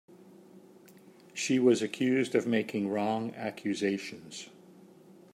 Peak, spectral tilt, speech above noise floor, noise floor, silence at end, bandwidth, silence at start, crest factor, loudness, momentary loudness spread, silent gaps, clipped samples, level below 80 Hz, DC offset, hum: -12 dBFS; -5 dB/octave; 26 dB; -56 dBFS; 0.85 s; 15.5 kHz; 0.55 s; 20 dB; -30 LUFS; 18 LU; none; under 0.1%; -80 dBFS; under 0.1%; none